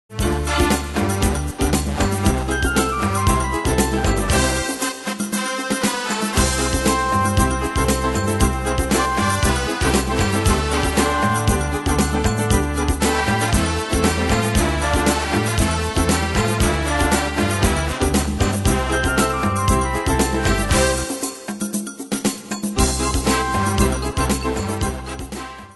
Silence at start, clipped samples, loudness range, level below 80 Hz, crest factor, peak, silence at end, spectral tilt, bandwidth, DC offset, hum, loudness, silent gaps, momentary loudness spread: 0.1 s; under 0.1%; 2 LU; -26 dBFS; 16 dB; -2 dBFS; 0 s; -4.5 dB/octave; 12.5 kHz; under 0.1%; none; -19 LUFS; none; 5 LU